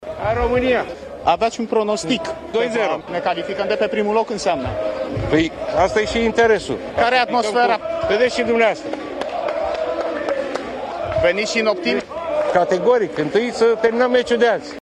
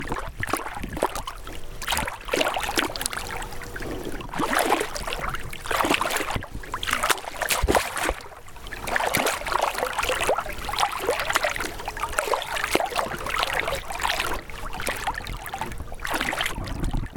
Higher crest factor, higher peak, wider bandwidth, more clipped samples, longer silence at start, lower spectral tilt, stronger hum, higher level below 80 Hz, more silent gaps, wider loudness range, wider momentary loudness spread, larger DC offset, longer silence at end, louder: second, 16 dB vs 26 dB; about the same, -2 dBFS vs 0 dBFS; second, 10.5 kHz vs 18 kHz; neither; about the same, 0 s vs 0 s; first, -4.5 dB/octave vs -2.5 dB/octave; neither; about the same, -42 dBFS vs -38 dBFS; neither; about the same, 3 LU vs 3 LU; second, 8 LU vs 11 LU; neither; about the same, 0 s vs 0 s; first, -19 LUFS vs -26 LUFS